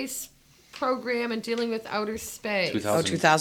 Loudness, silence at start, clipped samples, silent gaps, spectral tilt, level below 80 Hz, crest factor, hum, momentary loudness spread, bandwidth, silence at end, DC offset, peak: -27 LUFS; 0 s; under 0.1%; none; -4 dB/octave; -62 dBFS; 24 dB; none; 10 LU; 18.5 kHz; 0 s; under 0.1%; -4 dBFS